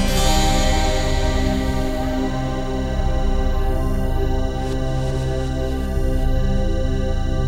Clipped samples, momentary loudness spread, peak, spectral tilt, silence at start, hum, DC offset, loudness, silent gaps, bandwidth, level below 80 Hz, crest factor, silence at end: under 0.1%; 6 LU; -4 dBFS; -5.5 dB/octave; 0 s; none; 0.2%; -22 LUFS; none; 15 kHz; -20 dBFS; 14 dB; 0 s